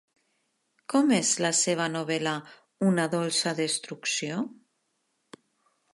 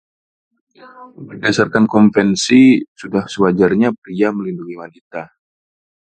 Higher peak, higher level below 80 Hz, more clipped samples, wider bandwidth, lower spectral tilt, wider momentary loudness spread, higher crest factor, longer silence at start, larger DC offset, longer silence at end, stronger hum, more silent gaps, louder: second, -10 dBFS vs 0 dBFS; second, -80 dBFS vs -52 dBFS; neither; first, 11.5 kHz vs 9.2 kHz; second, -3.5 dB/octave vs -5.5 dB/octave; second, 10 LU vs 20 LU; about the same, 18 dB vs 16 dB; about the same, 0.9 s vs 1 s; neither; first, 1.4 s vs 0.9 s; neither; second, none vs 2.88-2.96 s, 3.98-4.02 s, 5.01-5.10 s; second, -26 LUFS vs -14 LUFS